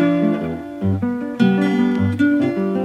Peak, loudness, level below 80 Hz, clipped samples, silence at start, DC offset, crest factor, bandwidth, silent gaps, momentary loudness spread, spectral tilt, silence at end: -2 dBFS; -18 LUFS; -52 dBFS; under 0.1%; 0 s; under 0.1%; 14 dB; 9 kHz; none; 7 LU; -8.5 dB/octave; 0 s